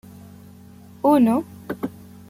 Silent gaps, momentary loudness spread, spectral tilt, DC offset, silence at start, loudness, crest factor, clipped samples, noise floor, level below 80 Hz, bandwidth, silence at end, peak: none; 16 LU; -7.5 dB/octave; under 0.1%; 1.05 s; -21 LUFS; 16 dB; under 0.1%; -45 dBFS; -62 dBFS; 15.5 kHz; 0.4 s; -6 dBFS